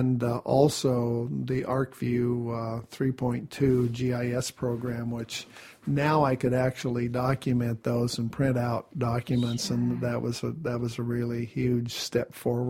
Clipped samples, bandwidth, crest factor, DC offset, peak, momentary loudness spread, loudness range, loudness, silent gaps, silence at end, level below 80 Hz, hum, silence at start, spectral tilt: under 0.1%; 16 kHz; 20 dB; under 0.1%; -8 dBFS; 7 LU; 2 LU; -28 LUFS; none; 0 s; -54 dBFS; none; 0 s; -6.5 dB/octave